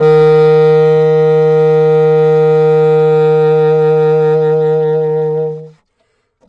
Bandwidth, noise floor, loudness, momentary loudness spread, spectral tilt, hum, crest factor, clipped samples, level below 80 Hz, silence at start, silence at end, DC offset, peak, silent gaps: 5.2 kHz; -61 dBFS; -10 LUFS; 6 LU; -9 dB/octave; none; 8 dB; under 0.1%; -60 dBFS; 0 s; 0.8 s; under 0.1%; -2 dBFS; none